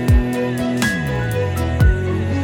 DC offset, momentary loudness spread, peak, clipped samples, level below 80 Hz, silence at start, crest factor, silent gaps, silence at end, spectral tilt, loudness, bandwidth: under 0.1%; 4 LU; -2 dBFS; under 0.1%; -22 dBFS; 0 s; 14 dB; none; 0 s; -6.5 dB/octave; -19 LUFS; 18 kHz